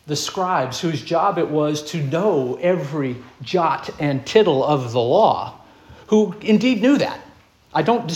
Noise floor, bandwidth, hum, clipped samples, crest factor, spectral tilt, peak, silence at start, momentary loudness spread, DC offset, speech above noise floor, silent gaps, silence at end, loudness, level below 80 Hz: -49 dBFS; 14 kHz; none; under 0.1%; 18 dB; -5.5 dB/octave; -2 dBFS; 0.05 s; 9 LU; under 0.1%; 30 dB; none; 0 s; -19 LUFS; -58 dBFS